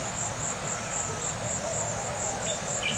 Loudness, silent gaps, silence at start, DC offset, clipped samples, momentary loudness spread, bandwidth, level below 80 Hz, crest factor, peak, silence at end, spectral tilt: -30 LUFS; none; 0 s; under 0.1%; under 0.1%; 2 LU; 16.5 kHz; -52 dBFS; 14 dB; -16 dBFS; 0 s; -2.5 dB/octave